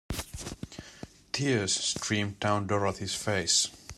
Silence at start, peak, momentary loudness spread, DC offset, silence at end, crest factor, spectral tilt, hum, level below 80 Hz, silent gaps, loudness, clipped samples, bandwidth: 0.1 s; -12 dBFS; 18 LU; under 0.1%; 0.05 s; 20 dB; -3 dB/octave; none; -52 dBFS; none; -29 LUFS; under 0.1%; 16 kHz